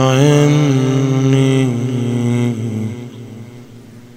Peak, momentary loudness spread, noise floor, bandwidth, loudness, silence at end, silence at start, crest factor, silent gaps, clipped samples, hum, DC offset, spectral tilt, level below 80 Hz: 0 dBFS; 21 LU; -37 dBFS; 15 kHz; -14 LUFS; 0.05 s; 0 s; 14 dB; none; under 0.1%; none; under 0.1%; -6.5 dB/octave; -52 dBFS